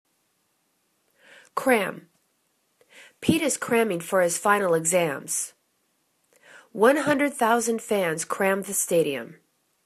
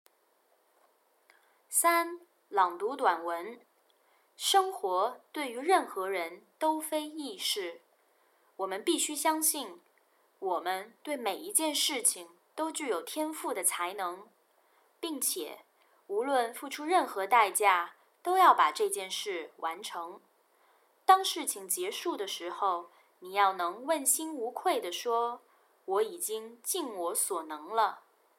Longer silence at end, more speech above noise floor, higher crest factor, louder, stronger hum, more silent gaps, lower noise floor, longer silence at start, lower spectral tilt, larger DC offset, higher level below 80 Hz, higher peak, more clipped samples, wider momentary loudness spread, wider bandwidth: first, 0.55 s vs 0.4 s; first, 48 dB vs 40 dB; about the same, 20 dB vs 22 dB; first, -24 LUFS vs -30 LUFS; neither; neither; about the same, -71 dBFS vs -70 dBFS; second, 1.55 s vs 1.7 s; first, -3.5 dB/octave vs 0 dB/octave; neither; first, -70 dBFS vs under -90 dBFS; first, -6 dBFS vs -10 dBFS; neither; second, 10 LU vs 13 LU; second, 14 kHz vs 16.5 kHz